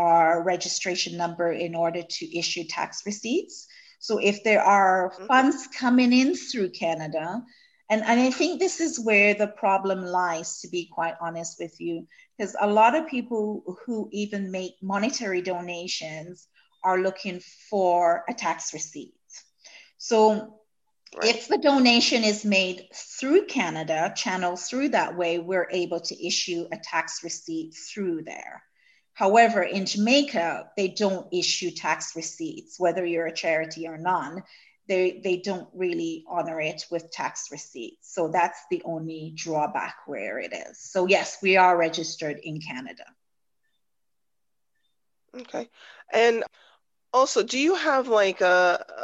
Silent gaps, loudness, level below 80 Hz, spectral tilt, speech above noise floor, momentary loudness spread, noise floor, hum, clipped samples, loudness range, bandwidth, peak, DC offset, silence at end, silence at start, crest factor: none; -25 LUFS; -76 dBFS; -3.5 dB/octave; 60 dB; 16 LU; -85 dBFS; none; under 0.1%; 7 LU; 9 kHz; -4 dBFS; under 0.1%; 0 s; 0 s; 20 dB